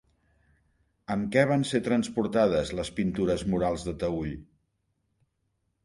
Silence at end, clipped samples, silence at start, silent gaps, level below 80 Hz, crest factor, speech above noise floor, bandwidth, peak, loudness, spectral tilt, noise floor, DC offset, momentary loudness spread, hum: 1.4 s; under 0.1%; 1.1 s; none; -50 dBFS; 22 dB; 49 dB; 11.5 kHz; -8 dBFS; -28 LUFS; -6 dB/octave; -76 dBFS; under 0.1%; 9 LU; none